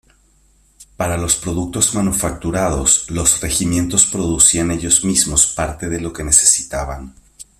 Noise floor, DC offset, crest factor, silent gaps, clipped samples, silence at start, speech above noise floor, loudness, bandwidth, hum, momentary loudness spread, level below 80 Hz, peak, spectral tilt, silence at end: -54 dBFS; under 0.1%; 18 dB; none; under 0.1%; 0.8 s; 38 dB; -14 LUFS; 16 kHz; none; 12 LU; -34 dBFS; 0 dBFS; -3 dB/octave; 0.15 s